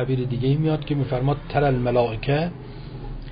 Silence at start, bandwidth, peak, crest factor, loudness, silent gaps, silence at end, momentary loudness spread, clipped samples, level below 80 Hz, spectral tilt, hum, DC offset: 0 s; 5.2 kHz; -8 dBFS; 14 dB; -23 LUFS; none; 0 s; 16 LU; under 0.1%; -38 dBFS; -12.5 dB/octave; none; under 0.1%